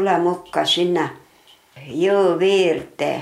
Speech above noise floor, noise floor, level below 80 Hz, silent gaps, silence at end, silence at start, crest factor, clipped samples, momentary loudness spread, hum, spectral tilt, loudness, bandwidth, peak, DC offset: 33 dB; -52 dBFS; -62 dBFS; none; 0 s; 0 s; 16 dB; under 0.1%; 8 LU; none; -4.5 dB/octave; -19 LUFS; 13 kHz; -4 dBFS; under 0.1%